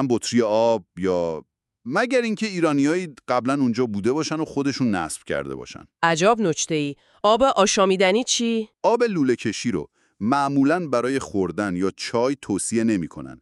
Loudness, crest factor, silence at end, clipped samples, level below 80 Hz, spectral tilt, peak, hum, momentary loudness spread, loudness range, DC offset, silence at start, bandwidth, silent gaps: -22 LUFS; 18 dB; 0.05 s; under 0.1%; -58 dBFS; -4.5 dB/octave; -4 dBFS; none; 10 LU; 3 LU; under 0.1%; 0 s; 12 kHz; none